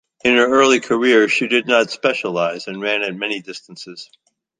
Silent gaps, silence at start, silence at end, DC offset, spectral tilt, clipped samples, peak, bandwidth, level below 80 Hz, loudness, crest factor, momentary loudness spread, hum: none; 0.25 s; 0.55 s; under 0.1%; -3.5 dB/octave; under 0.1%; -2 dBFS; 9.6 kHz; -62 dBFS; -16 LUFS; 16 dB; 20 LU; none